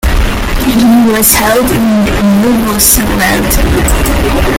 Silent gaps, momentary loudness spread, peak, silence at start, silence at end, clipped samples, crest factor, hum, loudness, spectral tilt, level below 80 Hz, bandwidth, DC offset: none; 5 LU; 0 dBFS; 0.05 s; 0 s; 0.4%; 8 dB; none; -8 LUFS; -4 dB/octave; -16 dBFS; over 20 kHz; under 0.1%